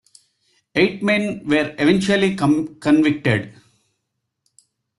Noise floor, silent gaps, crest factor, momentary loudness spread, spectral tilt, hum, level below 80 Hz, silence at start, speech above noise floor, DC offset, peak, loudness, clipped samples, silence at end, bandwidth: -76 dBFS; none; 16 dB; 5 LU; -6 dB/octave; none; -56 dBFS; 0.75 s; 59 dB; under 0.1%; -4 dBFS; -18 LUFS; under 0.1%; 1.5 s; 11.5 kHz